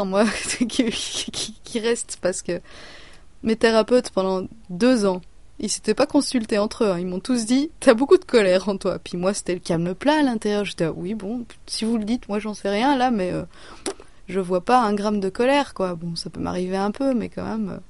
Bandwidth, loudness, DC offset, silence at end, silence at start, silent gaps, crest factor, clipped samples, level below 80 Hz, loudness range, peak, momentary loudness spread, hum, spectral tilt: 11.5 kHz; -22 LUFS; 0.6%; 0.05 s; 0 s; none; 20 dB; under 0.1%; -50 dBFS; 4 LU; -2 dBFS; 12 LU; none; -4.5 dB/octave